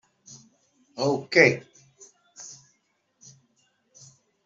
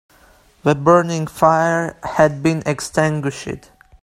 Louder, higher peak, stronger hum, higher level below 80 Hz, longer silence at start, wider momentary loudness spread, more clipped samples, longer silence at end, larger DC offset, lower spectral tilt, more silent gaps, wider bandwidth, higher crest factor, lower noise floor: second, -22 LUFS vs -17 LUFS; about the same, -2 dBFS vs 0 dBFS; neither; second, -72 dBFS vs -50 dBFS; first, 0.95 s vs 0.65 s; first, 25 LU vs 11 LU; neither; first, 1.95 s vs 0.45 s; neither; second, -4.5 dB/octave vs -6 dB/octave; neither; second, 7.8 kHz vs 14.5 kHz; first, 28 dB vs 18 dB; first, -72 dBFS vs -51 dBFS